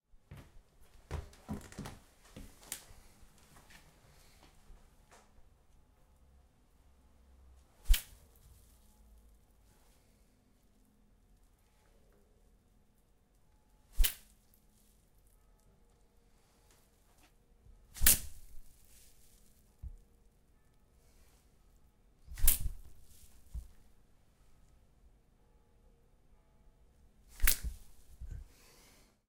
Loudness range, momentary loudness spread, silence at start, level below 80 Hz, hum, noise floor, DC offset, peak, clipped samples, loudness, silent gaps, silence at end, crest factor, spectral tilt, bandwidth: 24 LU; 30 LU; 0.3 s; -44 dBFS; none; -69 dBFS; under 0.1%; -6 dBFS; under 0.1%; -35 LUFS; none; 0.85 s; 34 dB; -1.5 dB/octave; 16 kHz